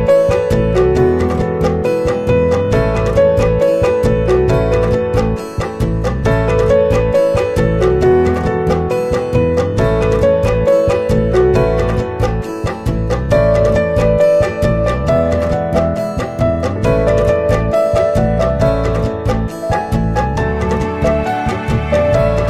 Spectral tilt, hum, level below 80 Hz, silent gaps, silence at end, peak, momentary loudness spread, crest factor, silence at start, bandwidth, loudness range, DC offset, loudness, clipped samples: -7.5 dB/octave; none; -24 dBFS; none; 0 s; 0 dBFS; 6 LU; 12 dB; 0 s; 14.5 kHz; 2 LU; under 0.1%; -14 LUFS; under 0.1%